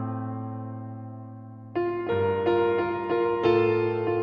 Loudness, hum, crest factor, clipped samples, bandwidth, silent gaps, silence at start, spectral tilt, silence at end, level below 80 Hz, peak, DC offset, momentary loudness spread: -26 LUFS; none; 16 dB; under 0.1%; 5.4 kHz; none; 0 s; -9 dB/octave; 0 s; -62 dBFS; -10 dBFS; under 0.1%; 17 LU